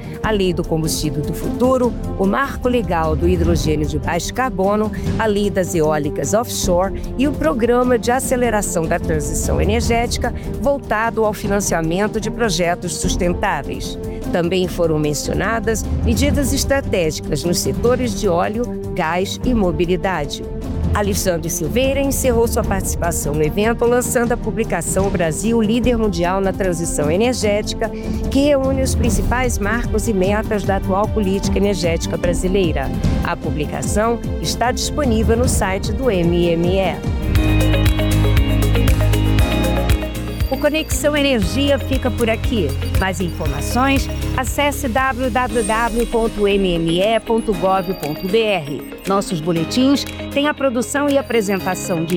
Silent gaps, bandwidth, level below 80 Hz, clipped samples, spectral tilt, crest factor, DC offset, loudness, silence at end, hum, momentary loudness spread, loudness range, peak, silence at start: none; 19.5 kHz; -26 dBFS; under 0.1%; -5 dB/octave; 12 dB; under 0.1%; -18 LUFS; 0 s; none; 5 LU; 2 LU; -6 dBFS; 0 s